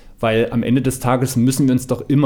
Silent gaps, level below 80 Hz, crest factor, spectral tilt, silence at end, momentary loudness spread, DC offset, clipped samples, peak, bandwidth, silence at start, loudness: none; -40 dBFS; 14 dB; -6 dB/octave; 0 s; 3 LU; under 0.1%; under 0.1%; -4 dBFS; 19.5 kHz; 0.05 s; -17 LUFS